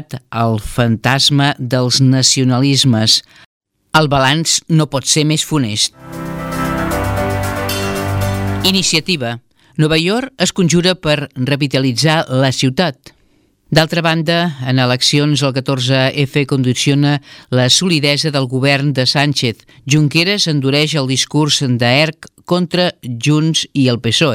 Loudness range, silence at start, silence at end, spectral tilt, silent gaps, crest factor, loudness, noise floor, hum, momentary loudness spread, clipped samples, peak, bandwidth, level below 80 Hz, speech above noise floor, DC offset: 4 LU; 0 s; 0 s; -4 dB/octave; 3.46-3.61 s; 14 dB; -14 LUFS; -55 dBFS; none; 7 LU; under 0.1%; 0 dBFS; 16.5 kHz; -40 dBFS; 41 dB; under 0.1%